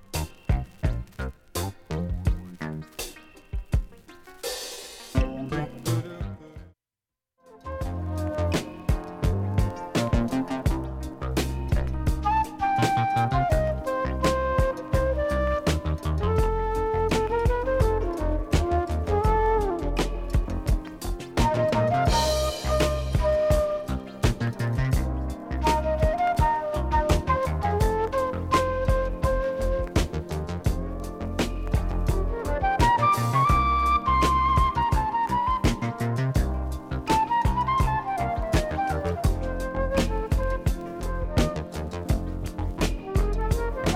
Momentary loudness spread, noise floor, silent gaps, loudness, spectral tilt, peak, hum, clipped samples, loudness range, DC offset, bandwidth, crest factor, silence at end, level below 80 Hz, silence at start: 10 LU; -90 dBFS; none; -26 LUFS; -6 dB/octave; -6 dBFS; none; under 0.1%; 9 LU; under 0.1%; 16 kHz; 18 dB; 0 s; -30 dBFS; 0.15 s